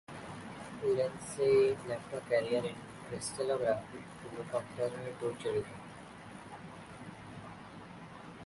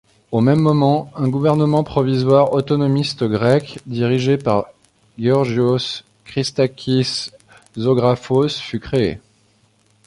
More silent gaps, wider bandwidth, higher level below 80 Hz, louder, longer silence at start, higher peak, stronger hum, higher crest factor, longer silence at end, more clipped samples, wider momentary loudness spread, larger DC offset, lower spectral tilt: neither; about the same, 11.5 kHz vs 11.5 kHz; second, -66 dBFS vs -50 dBFS; second, -35 LUFS vs -18 LUFS; second, 0.1 s vs 0.3 s; second, -18 dBFS vs -2 dBFS; neither; about the same, 18 dB vs 16 dB; second, 0 s vs 0.9 s; neither; first, 18 LU vs 11 LU; neither; second, -5 dB/octave vs -7 dB/octave